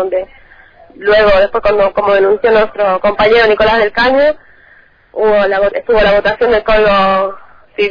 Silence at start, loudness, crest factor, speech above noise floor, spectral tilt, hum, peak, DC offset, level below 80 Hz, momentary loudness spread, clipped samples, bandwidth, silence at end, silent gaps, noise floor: 0 s; -11 LUFS; 12 dB; 35 dB; -6 dB/octave; none; 0 dBFS; under 0.1%; -32 dBFS; 10 LU; under 0.1%; 5.2 kHz; 0 s; none; -45 dBFS